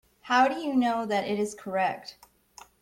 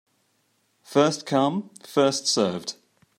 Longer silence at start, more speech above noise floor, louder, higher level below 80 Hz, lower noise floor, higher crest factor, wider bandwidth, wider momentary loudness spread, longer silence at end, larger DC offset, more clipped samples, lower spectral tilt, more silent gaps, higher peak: second, 0.25 s vs 0.9 s; second, 27 dB vs 46 dB; second, -27 LUFS vs -23 LUFS; first, -68 dBFS vs -74 dBFS; second, -54 dBFS vs -69 dBFS; about the same, 18 dB vs 20 dB; about the same, 16.5 kHz vs 15.5 kHz; second, 7 LU vs 12 LU; first, 0.7 s vs 0.45 s; neither; neither; about the same, -4.5 dB/octave vs -4 dB/octave; neither; second, -10 dBFS vs -6 dBFS